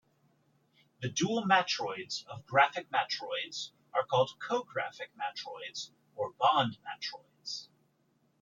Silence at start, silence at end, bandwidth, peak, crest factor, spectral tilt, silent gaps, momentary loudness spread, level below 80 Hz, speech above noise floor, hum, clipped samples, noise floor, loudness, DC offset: 1 s; 0.75 s; 7.6 kHz; -12 dBFS; 22 dB; -3.5 dB/octave; none; 14 LU; -78 dBFS; 40 dB; none; under 0.1%; -73 dBFS; -33 LUFS; under 0.1%